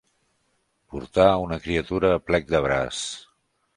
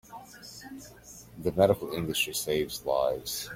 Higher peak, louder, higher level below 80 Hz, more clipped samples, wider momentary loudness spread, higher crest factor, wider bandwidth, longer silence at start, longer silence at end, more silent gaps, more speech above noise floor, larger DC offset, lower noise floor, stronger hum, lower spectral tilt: first, -2 dBFS vs -6 dBFS; first, -23 LUFS vs -28 LUFS; first, -44 dBFS vs -56 dBFS; neither; second, 16 LU vs 22 LU; about the same, 22 dB vs 24 dB; second, 11 kHz vs 16.5 kHz; first, 0.9 s vs 0.1 s; first, 0.55 s vs 0 s; neither; first, 48 dB vs 22 dB; neither; first, -70 dBFS vs -50 dBFS; neither; about the same, -5 dB/octave vs -4 dB/octave